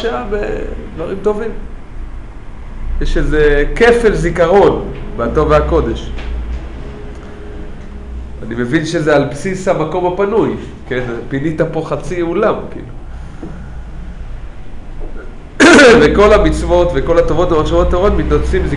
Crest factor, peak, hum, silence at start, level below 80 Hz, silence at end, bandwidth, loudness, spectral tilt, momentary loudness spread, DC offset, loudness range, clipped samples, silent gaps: 14 dB; 0 dBFS; none; 0 s; -22 dBFS; 0 s; 11 kHz; -13 LUFS; -5.5 dB/octave; 22 LU; under 0.1%; 12 LU; under 0.1%; none